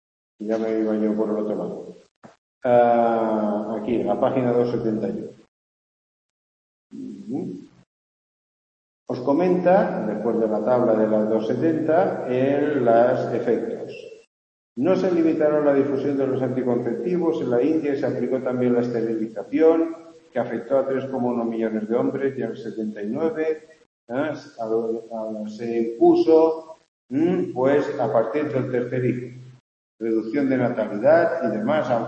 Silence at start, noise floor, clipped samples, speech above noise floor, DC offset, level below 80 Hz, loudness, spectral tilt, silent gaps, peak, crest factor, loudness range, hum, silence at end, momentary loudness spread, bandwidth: 0.4 s; under -90 dBFS; under 0.1%; over 69 dB; under 0.1%; -68 dBFS; -22 LUFS; -8.5 dB/octave; 2.11-2.22 s, 2.38-2.61 s, 5.48-6.90 s, 7.87-9.06 s, 14.27-14.76 s, 23.86-24.07 s, 26.88-27.09 s, 29.60-29.98 s; -4 dBFS; 18 dB; 7 LU; none; 0 s; 13 LU; 8 kHz